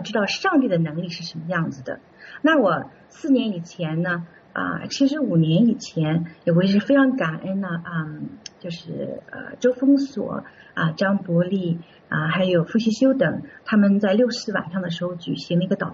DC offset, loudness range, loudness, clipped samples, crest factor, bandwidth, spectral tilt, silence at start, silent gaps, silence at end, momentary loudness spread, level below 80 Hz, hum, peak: under 0.1%; 4 LU; -22 LUFS; under 0.1%; 14 dB; 7.6 kHz; -5.5 dB/octave; 0 s; none; 0 s; 14 LU; -64 dBFS; none; -6 dBFS